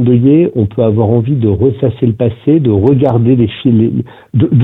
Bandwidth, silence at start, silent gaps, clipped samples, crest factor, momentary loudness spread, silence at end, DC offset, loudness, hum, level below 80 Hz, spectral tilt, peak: 4 kHz; 0 s; none; under 0.1%; 10 dB; 5 LU; 0 s; under 0.1%; -11 LUFS; none; -40 dBFS; -12 dB/octave; 0 dBFS